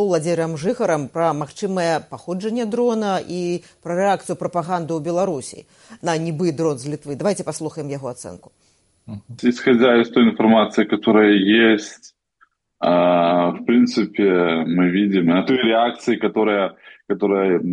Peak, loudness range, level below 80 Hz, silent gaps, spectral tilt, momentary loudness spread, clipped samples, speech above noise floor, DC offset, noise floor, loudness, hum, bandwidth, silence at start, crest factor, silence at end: -4 dBFS; 8 LU; -64 dBFS; none; -5.5 dB/octave; 13 LU; under 0.1%; 42 dB; under 0.1%; -60 dBFS; -19 LUFS; none; 11.5 kHz; 0 s; 14 dB; 0 s